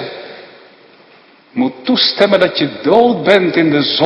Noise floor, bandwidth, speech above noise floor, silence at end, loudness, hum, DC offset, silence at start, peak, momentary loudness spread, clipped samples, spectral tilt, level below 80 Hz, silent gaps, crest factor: -45 dBFS; 11 kHz; 33 dB; 0 s; -12 LUFS; none; under 0.1%; 0 s; 0 dBFS; 16 LU; 0.2%; -6.5 dB/octave; -56 dBFS; none; 14 dB